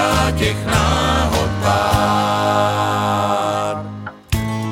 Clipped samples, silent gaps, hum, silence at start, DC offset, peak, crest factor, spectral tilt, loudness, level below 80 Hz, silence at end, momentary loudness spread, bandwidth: under 0.1%; none; none; 0 s; under 0.1%; -2 dBFS; 14 dB; -5 dB/octave; -17 LUFS; -28 dBFS; 0 s; 8 LU; 17 kHz